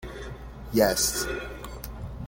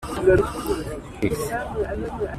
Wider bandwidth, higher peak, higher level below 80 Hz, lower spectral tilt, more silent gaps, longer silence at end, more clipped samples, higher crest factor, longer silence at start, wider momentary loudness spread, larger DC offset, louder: first, 17 kHz vs 14.5 kHz; about the same, -8 dBFS vs -6 dBFS; second, -42 dBFS vs -36 dBFS; second, -3 dB/octave vs -6 dB/octave; neither; about the same, 0 s vs 0 s; neither; about the same, 22 dB vs 18 dB; about the same, 0 s vs 0 s; first, 18 LU vs 10 LU; neither; about the same, -25 LUFS vs -24 LUFS